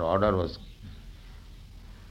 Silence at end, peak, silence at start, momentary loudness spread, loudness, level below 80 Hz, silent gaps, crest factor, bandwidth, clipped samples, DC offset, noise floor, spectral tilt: 0 s; -10 dBFS; 0 s; 25 LU; -27 LUFS; -46 dBFS; none; 22 dB; 15 kHz; under 0.1%; under 0.1%; -47 dBFS; -8 dB/octave